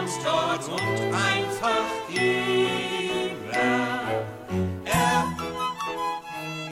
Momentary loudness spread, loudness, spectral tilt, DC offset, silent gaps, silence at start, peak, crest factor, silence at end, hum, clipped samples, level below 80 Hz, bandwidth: 7 LU; -26 LUFS; -4 dB/octave; under 0.1%; none; 0 s; -8 dBFS; 18 dB; 0 s; none; under 0.1%; -54 dBFS; 16 kHz